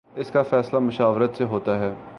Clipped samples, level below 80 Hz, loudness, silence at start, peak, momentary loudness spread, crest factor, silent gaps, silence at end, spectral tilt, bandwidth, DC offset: under 0.1%; -58 dBFS; -22 LUFS; 0.15 s; -6 dBFS; 4 LU; 16 dB; none; 0 s; -8.5 dB/octave; 10.5 kHz; under 0.1%